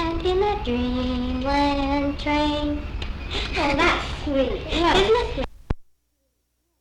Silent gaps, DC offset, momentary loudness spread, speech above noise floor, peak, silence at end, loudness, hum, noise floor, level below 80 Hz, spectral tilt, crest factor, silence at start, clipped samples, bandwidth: none; under 0.1%; 12 LU; 50 dB; -6 dBFS; 1 s; -23 LUFS; none; -72 dBFS; -32 dBFS; -5.5 dB/octave; 16 dB; 0 s; under 0.1%; 11.5 kHz